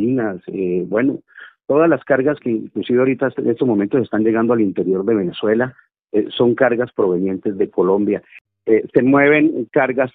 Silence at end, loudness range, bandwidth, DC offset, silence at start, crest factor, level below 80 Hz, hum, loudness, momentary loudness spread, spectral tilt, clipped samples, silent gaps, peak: 0.05 s; 2 LU; 4 kHz; under 0.1%; 0 s; 16 dB; -58 dBFS; none; -17 LUFS; 8 LU; -10.5 dB/octave; under 0.1%; 8.41-8.45 s; 0 dBFS